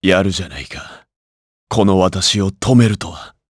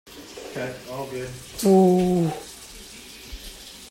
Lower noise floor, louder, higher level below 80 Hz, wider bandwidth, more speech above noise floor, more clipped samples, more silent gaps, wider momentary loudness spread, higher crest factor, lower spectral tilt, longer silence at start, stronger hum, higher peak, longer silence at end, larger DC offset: first, under -90 dBFS vs -42 dBFS; first, -15 LUFS vs -22 LUFS; first, -42 dBFS vs -48 dBFS; second, 11 kHz vs 16.5 kHz; first, over 75 dB vs 21 dB; neither; first, 1.16-1.67 s vs none; second, 16 LU vs 23 LU; about the same, 16 dB vs 18 dB; second, -5 dB/octave vs -6.5 dB/octave; about the same, 0 s vs 0.05 s; neither; first, 0 dBFS vs -6 dBFS; first, 0.2 s vs 0 s; neither